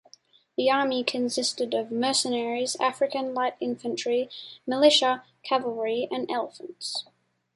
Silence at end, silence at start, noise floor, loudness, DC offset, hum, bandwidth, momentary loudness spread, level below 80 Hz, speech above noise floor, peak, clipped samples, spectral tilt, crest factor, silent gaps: 0.55 s; 0.6 s; -58 dBFS; -26 LUFS; under 0.1%; none; 11.5 kHz; 11 LU; -76 dBFS; 32 dB; -6 dBFS; under 0.1%; -2 dB/octave; 20 dB; none